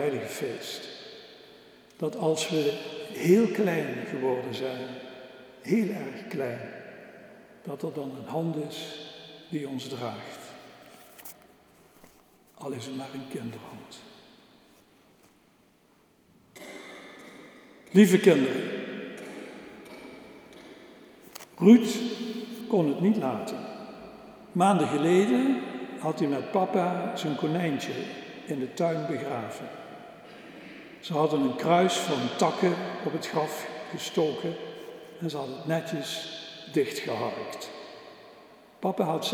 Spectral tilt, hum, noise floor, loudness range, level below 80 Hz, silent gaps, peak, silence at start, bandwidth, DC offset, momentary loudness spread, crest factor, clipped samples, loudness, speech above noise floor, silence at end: -5.5 dB/octave; none; -63 dBFS; 15 LU; -76 dBFS; none; -6 dBFS; 0 s; over 20 kHz; under 0.1%; 23 LU; 24 dB; under 0.1%; -28 LUFS; 36 dB; 0 s